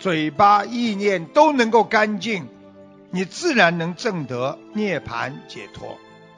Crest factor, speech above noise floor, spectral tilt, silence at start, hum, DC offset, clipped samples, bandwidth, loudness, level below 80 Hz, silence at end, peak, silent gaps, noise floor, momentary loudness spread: 20 dB; 25 dB; -5 dB/octave; 0 s; none; under 0.1%; under 0.1%; 10.5 kHz; -20 LUFS; -60 dBFS; 0.4 s; -2 dBFS; none; -45 dBFS; 20 LU